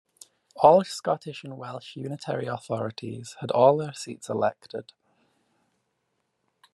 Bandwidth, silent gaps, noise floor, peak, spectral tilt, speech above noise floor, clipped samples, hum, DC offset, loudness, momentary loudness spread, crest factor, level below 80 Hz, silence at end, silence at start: 12.5 kHz; none; -76 dBFS; -2 dBFS; -5.5 dB/octave; 51 dB; under 0.1%; none; under 0.1%; -25 LUFS; 19 LU; 24 dB; -72 dBFS; 1.9 s; 0.55 s